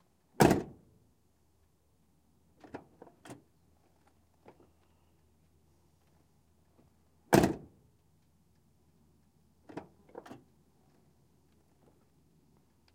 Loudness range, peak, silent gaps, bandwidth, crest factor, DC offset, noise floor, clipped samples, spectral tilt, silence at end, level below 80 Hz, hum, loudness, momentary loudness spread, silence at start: 22 LU; -8 dBFS; none; 16 kHz; 32 dB; under 0.1%; -72 dBFS; under 0.1%; -5.5 dB/octave; 3.15 s; -60 dBFS; none; -29 LUFS; 28 LU; 0.4 s